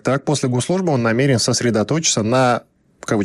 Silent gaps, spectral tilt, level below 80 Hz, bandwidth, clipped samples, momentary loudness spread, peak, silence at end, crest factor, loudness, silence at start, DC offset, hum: none; -4.5 dB/octave; -54 dBFS; 12.5 kHz; under 0.1%; 4 LU; -4 dBFS; 0 s; 14 dB; -17 LUFS; 0.05 s; under 0.1%; none